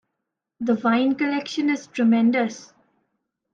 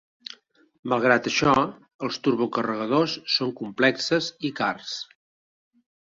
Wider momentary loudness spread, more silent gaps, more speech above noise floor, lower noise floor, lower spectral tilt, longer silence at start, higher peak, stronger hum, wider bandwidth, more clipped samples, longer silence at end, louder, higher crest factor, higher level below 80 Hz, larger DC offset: second, 9 LU vs 15 LU; second, none vs 1.94-1.99 s; first, 60 dB vs 26 dB; first, -81 dBFS vs -50 dBFS; about the same, -5.5 dB/octave vs -4.5 dB/octave; second, 0.6 s vs 0.85 s; second, -8 dBFS vs -4 dBFS; neither; about the same, 7.6 kHz vs 7.8 kHz; neither; second, 0.9 s vs 1.1 s; about the same, -22 LUFS vs -24 LUFS; second, 14 dB vs 22 dB; second, -70 dBFS vs -60 dBFS; neither